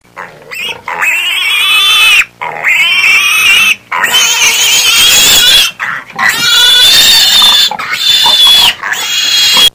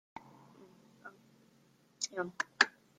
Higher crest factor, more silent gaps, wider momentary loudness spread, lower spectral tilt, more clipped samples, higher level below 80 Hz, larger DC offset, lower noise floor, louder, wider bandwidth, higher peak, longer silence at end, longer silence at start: second, 8 dB vs 32 dB; neither; second, 11 LU vs 25 LU; second, 2 dB/octave vs -1 dB/octave; first, 3% vs under 0.1%; first, -42 dBFS vs -84 dBFS; neither; second, -28 dBFS vs -68 dBFS; first, -4 LUFS vs -34 LUFS; first, over 20 kHz vs 15.5 kHz; first, 0 dBFS vs -8 dBFS; second, 0.05 s vs 0.3 s; second, 0.15 s vs 1.05 s